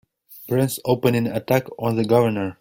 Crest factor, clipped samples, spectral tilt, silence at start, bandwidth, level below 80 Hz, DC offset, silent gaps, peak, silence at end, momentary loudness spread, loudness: 18 dB; under 0.1%; -6.5 dB/octave; 0.3 s; 17 kHz; -56 dBFS; under 0.1%; none; -4 dBFS; 0.1 s; 6 LU; -21 LUFS